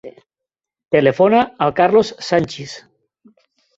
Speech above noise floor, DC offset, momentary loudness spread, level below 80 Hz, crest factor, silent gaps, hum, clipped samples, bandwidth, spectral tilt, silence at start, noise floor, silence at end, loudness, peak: 69 dB; under 0.1%; 17 LU; -56 dBFS; 16 dB; none; none; under 0.1%; 8 kHz; -6 dB/octave; 0.05 s; -85 dBFS; 1 s; -16 LUFS; -2 dBFS